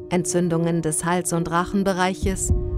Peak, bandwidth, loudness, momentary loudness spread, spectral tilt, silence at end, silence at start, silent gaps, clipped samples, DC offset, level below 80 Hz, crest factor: -8 dBFS; 15.5 kHz; -22 LUFS; 1 LU; -5 dB/octave; 0 s; 0 s; none; under 0.1%; under 0.1%; -32 dBFS; 14 dB